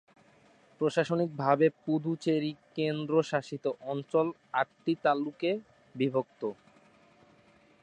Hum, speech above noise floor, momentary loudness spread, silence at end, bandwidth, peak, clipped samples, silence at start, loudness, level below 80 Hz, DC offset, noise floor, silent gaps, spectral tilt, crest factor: none; 32 dB; 9 LU; 1.3 s; 9.8 kHz; -10 dBFS; under 0.1%; 0.8 s; -31 LUFS; -78 dBFS; under 0.1%; -62 dBFS; none; -7 dB/octave; 20 dB